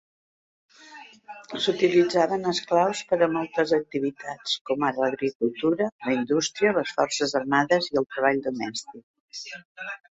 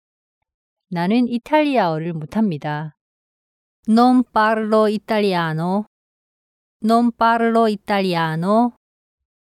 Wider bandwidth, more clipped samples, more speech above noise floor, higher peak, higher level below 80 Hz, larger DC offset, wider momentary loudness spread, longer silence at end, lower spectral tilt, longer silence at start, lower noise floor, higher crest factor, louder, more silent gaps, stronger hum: second, 8 kHz vs 14 kHz; neither; second, 23 dB vs over 73 dB; about the same, -6 dBFS vs -4 dBFS; second, -66 dBFS vs -60 dBFS; neither; first, 16 LU vs 10 LU; second, 0.15 s vs 0.85 s; second, -4 dB/octave vs -7 dB/octave; about the same, 0.85 s vs 0.9 s; second, -47 dBFS vs under -90 dBFS; about the same, 20 dB vs 16 dB; second, -24 LUFS vs -18 LUFS; second, 4.61-4.65 s, 5.35-5.40 s, 5.92-5.99 s, 9.03-9.14 s, 9.20-9.28 s, 9.65-9.75 s vs 3.01-3.83 s, 5.87-6.80 s; neither